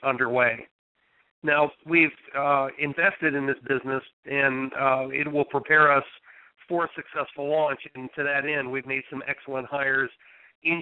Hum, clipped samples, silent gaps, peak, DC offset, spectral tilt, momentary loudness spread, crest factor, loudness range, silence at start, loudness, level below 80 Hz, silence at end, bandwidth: none; under 0.1%; 0.71-0.95 s, 1.31-1.42 s, 4.13-4.23 s, 10.55-10.62 s; -6 dBFS; under 0.1%; -8 dB/octave; 11 LU; 18 dB; 4 LU; 0 s; -25 LUFS; -70 dBFS; 0 s; 4.2 kHz